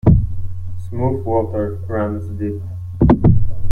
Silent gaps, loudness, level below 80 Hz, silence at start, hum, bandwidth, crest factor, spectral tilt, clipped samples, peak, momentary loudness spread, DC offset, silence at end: none; -19 LUFS; -26 dBFS; 0.05 s; none; 3.6 kHz; 14 dB; -11.5 dB/octave; under 0.1%; -2 dBFS; 15 LU; under 0.1%; 0 s